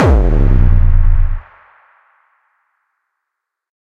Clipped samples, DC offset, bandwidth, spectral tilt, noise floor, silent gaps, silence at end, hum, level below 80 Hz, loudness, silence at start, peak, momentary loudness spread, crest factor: under 0.1%; under 0.1%; 3.7 kHz; -9 dB/octave; -78 dBFS; none; 2.6 s; none; -14 dBFS; -14 LUFS; 0 s; 0 dBFS; 9 LU; 12 dB